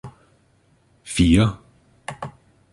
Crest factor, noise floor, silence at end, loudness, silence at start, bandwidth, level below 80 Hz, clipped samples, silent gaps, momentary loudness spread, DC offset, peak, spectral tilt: 20 dB; -60 dBFS; 0.45 s; -19 LUFS; 0.05 s; 11.5 kHz; -36 dBFS; under 0.1%; none; 24 LU; under 0.1%; -4 dBFS; -6 dB/octave